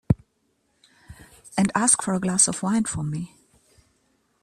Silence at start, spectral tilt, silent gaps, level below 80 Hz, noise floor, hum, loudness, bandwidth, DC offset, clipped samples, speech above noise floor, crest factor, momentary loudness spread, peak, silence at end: 0.1 s; -4 dB/octave; none; -48 dBFS; -70 dBFS; none; -22 LUFS; 14 kHz; under 0.1%; under 0.1%; 47 dB; 22 dB; 12 LU; -4 dBFS; 1.15 s